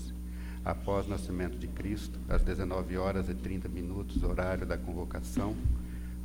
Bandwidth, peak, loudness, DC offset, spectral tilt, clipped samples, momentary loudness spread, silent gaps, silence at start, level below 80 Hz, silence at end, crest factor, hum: 16.5 kHz; -16 dBFS; -35 LUFS; under 0.1%; -7 dB/octave; under 0.1%; 6 LU; none; 0 s; -36 dBFS; 0 s; 16 dB; none